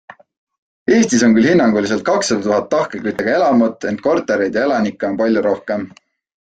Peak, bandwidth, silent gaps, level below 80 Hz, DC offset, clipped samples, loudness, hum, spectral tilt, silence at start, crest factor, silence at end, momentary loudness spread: -2 dBFS; 9.2 kHz; none; -54 dBFS; under 0.1%; under 0.1%; -16 LUFS; none; -5 dB/octave; 0.9 s; 14 dB; 0.55 s; 9 LU